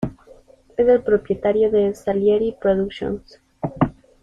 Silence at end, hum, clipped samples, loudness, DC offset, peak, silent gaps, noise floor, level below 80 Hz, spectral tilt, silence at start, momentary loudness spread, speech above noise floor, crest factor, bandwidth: 0.3 s; none; under 0.1%; -20 LUFS; under 0.1%; -4 dBFS; none; -49 dBFS; -46 dBFS; -8 dB/octave; 0 s; 13 LU; 30 dB; 18 dB; 7.6 kHz